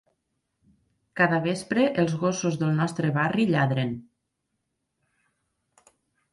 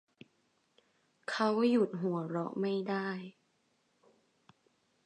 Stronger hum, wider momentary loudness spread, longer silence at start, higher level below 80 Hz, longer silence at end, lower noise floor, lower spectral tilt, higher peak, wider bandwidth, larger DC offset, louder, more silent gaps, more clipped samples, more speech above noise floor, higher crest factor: neither; second, 6 LU vs 14 LU; second, 1.15 s vs 1.3 s; first, -64 dBFS vs -88 dBFS; first, 2.3 s vs 1.75 s; first, -79 dBFS vs -75 dBFS; about the same, -6 dB/octave vs -7 dB/octave; first, -8 dBFS vs -16 dBFS; first, 11.5 kHz vs 10 kHz; neither; first, -25 LUFS vs -33 LUFS; neither; neither; first, 55 dB vs 43 dB; about the same, 20 dB vs 20 dB